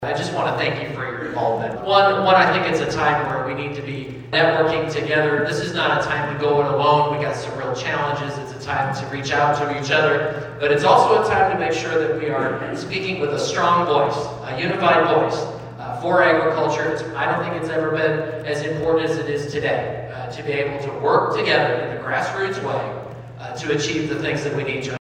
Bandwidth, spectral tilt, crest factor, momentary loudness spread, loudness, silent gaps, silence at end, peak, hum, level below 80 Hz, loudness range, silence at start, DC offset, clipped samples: 10.5 kHz; -5 dB/octave; 18 dB; 11 LU; -20 LUFS; none; 0.2 s; -2 dBFS; none; -52 dBFS; 4 LU; 0 s; under 0.1%; under 0.1%